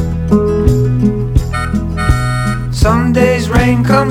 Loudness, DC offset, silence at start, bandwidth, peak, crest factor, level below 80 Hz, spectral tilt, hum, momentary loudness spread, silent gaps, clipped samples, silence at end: -13 LUFS; under 0.1%; 0 s; 15.5 kHz; 0 dBFS; 12 dB; -20 dBFS; -7 dB/octave; none; 6 LU; none; under 0.1%; 0 s